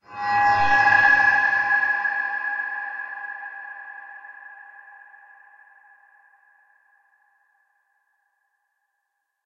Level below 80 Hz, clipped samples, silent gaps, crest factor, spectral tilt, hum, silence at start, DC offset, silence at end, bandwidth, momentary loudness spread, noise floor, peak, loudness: -62 dBFS; under 0.1%; none; 20 dB; -3 dB/octave; none; 0.1 s; under 0.1%; 4.85 s; 7.4 kHz; 25 LU; -78 dBFS; -4 dBFS; -19 LUFS